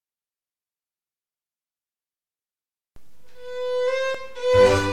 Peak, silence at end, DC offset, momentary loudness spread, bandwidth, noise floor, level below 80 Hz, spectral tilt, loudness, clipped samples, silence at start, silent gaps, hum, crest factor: -4 dBFS; 0 s; under 0.1%; 14 LU; 12 kHz; under -90 dBFS; -48 dBFS; -5 dB/octave; -21 LUFS; under 0.1%; 0 s; none; none; 20 dB